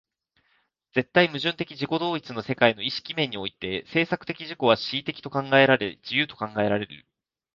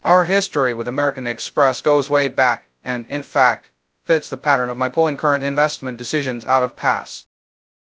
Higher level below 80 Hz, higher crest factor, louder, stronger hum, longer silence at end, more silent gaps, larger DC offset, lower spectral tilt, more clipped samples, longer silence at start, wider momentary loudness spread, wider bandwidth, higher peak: about the same, -62 dBFS vs -66 dBFS; about the same, 22 dB vs 20 dB; second, -25 LUFS vs -19 LUFS; neither; about the same, 0.55 s vs 0.65 s; neither; neither; first, -6.5 dB/octave vs -4.5 dB/octave; neither; first, 0.95 s vs 0.05 s; about the same, 10 LU vs 10 LU; second, 7.2 kHz vs 8 kHz; second, -4 dBFS vs 0 dBFS